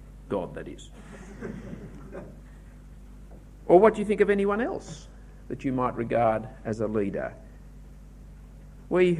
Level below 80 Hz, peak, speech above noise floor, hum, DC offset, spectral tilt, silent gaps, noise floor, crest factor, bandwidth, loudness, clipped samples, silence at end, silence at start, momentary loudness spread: -48 dBFS; -4 dBFS; 20 dB; 50 Hz at -45 dBFS; under 0.1%; -7.5 dB/octave; none; -46 dBFS; 24 dB; 11 kHz; -26 LUFS; under 0.1%; 0 s; 0 s; 24 LU